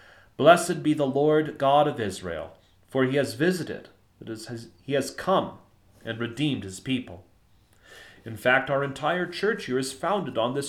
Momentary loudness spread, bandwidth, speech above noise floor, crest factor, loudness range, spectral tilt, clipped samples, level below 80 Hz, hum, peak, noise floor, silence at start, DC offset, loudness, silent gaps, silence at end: 18 LU; 16 kHz; 35 dB; 22 dB; 7 LU; -5 dB/octave; under 0.1%; -62 dBFS; none; -4 dBFS; -61 dBFS; 0.4 s; under 0.1%; -25 LUFS; none; 0 s